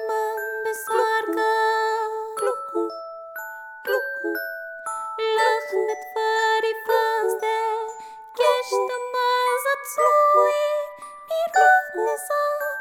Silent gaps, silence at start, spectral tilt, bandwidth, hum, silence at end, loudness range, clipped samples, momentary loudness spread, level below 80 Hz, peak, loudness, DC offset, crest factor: none; 0 s; -0.5 dB/octave; 17.5 kHz; none; 0 s; 6 LU; under 0.1%; 15 LU; -78 dBFS; -6 dBFS; -22 LUFS; under 0.1%; 18 dB